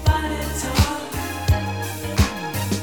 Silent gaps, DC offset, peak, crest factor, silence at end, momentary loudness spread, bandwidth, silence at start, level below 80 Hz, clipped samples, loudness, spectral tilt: none; 0.4%; -4 dBFS; 18 dB; 0 s; 6 LU; over 20 kHz; 0 s; -28 dBFS; under 0.1%; -23 LUFS; -5 dB/octave